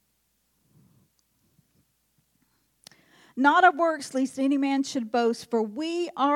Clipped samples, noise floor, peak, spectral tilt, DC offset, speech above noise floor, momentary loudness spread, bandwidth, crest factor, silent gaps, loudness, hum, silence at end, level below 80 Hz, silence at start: under 0.1%; -72 dBFS; -6 dBFS; -3.5 dB/octave; under 0.1%; 48 dB; 11 LU; 13 kHz; 20 dB; none; -24 LUFS; none; 0 s; -80 dBFS; 3.35 s